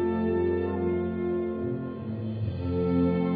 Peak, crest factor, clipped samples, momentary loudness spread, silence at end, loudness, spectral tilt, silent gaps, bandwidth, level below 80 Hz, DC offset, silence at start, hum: -14 dBFS; 12 dB; under 0.1%; 8 LU; 0 s; -29 LUFS; -12 dB/octave; none; 4.9 kHz; -50 dBFS; under 0.1%; 0 s; none